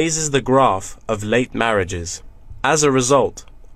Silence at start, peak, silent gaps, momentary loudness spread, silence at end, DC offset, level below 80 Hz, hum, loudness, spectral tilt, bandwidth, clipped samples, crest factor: 0 s; -2 dBFS; none; 11 LU; 0 s; under 0.1%; -40 dBFS; none; -18 LUFS; -4 dB/octave; 15 kHz; under 0.1%; 18 dB